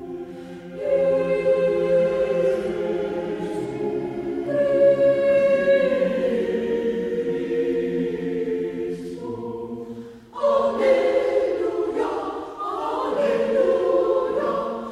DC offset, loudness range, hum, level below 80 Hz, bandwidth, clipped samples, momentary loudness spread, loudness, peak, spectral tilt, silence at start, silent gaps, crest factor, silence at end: under 0.1%; 5 LU; none; -54 dBFS; 10.5 kHz; under 0.1%; 13 LU; -22 LUFS; -6 dBFS; -7 dB/octave; 0 s; none; 16 dB; 0 s